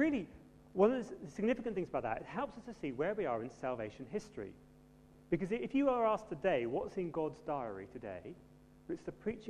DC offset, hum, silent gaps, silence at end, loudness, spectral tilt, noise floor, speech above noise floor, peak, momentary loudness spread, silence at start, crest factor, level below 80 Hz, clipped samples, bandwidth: under 0.1%; none; none; 0 s; -38 LUFS; -7 dB/octave; -61 dBFS; 24 dB; -18 dBFS; 15 LU; 0 s; 20 dB; -64 dBFS; under 0.1%; 11 kHz